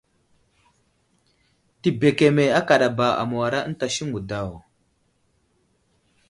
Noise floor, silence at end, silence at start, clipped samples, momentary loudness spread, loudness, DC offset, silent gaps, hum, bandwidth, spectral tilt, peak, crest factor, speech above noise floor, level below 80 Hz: -67 dBFS; 1.7 s; 1.85 s; under 0.1%; 11 LU; -21 LUFS; under 0.1%; none; none; 11.5 kHz; -5.5 dB/octave; -2 dBFS; 22 dB; 46 dB; -56 dBFS